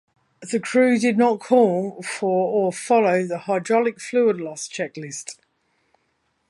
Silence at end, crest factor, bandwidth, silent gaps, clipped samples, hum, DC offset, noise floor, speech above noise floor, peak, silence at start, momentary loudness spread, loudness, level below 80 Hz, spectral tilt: 1.15 s; 18 dB; 11.5 kHz; none; under 0.1%; none; under 0.1%; -70 dBFS; 49 dB; -4 dBFS; 0.4 s; 12 LU; -21 LUFS; -76 dBFS; -5 dB/octave